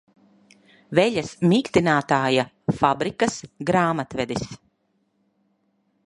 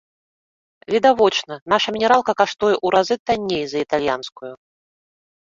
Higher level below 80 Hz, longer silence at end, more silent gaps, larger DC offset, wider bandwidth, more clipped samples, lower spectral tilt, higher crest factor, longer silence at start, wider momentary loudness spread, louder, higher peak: about the same, -56 dBFS vs -58 dBFS; first, 1.5 s vs 0.95 s; second, none vs 1.62-1.66 s, 3.19-3.26 s; neither; first, 11.5 kHz vs 7.8 kHz; neither; first, -5.5 dB/octave vs -4 dB/octave; about the same, 22 dB vs 18 dB; about the same, 0.9 s vs 0.9 s; about the same, 8 LU vs 9 LU; second, -22 LUFS vs -19 LUFS; about the same, -2 dBFS vs -2 dBFS